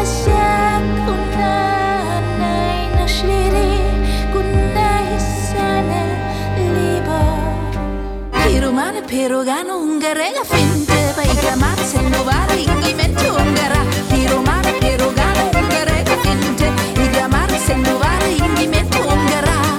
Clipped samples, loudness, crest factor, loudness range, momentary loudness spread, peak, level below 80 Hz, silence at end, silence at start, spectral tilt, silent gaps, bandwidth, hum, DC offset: under 0.1%; -16 LUFS; 14 dB; 3 LU; 5 LU; -2 dBFS; -22 dBFS; 0 s; 0 s; -5 dB/octave; none; 18.5 kHz; none; under 0.1%